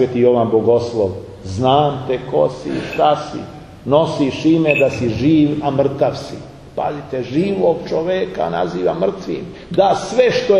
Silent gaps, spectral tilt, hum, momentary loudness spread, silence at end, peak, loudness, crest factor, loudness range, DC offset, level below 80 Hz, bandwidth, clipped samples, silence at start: none; -6.5 dB/octave; none; 13 LU; 0 s; 0 dBFS; -17 LUFS; 16 dB; 3 LU; under 0.1%; -46 dBFS; 11 kHz; under 0.1%; 0 s